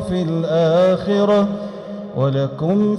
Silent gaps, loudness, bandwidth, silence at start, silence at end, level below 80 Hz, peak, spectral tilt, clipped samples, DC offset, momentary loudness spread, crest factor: none; -18 LUFS; 11 kHz; 0 s; 0 s; -50 dBFS; -6 dBFS; -8 dB/octave; under 0.1%; under 0.1%; 13 LU; 10 dB